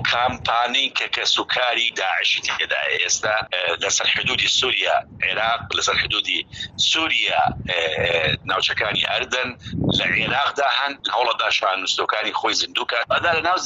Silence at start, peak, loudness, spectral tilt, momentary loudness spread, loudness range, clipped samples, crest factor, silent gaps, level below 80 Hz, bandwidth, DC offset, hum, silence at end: 0 s; -6 dBFS; -19 LUFS; -1.5 dB/octave; 4 LU; 1 LU; under 0.1%; 16 dB; none; -50 dBFS; 8.2 kHz; under 0.1%; none; 0 s